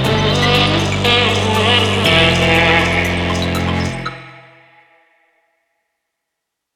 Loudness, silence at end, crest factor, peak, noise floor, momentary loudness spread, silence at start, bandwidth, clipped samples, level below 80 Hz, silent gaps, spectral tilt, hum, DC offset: -13 LUFS; 2.35 s; 16 dB; 0 dBFS; -78 dBFS; 9 LU; 0 s; 16 kHz; under 0.1%; -34 dBFS; none; -4.5 dB/octave; none; under 0.1%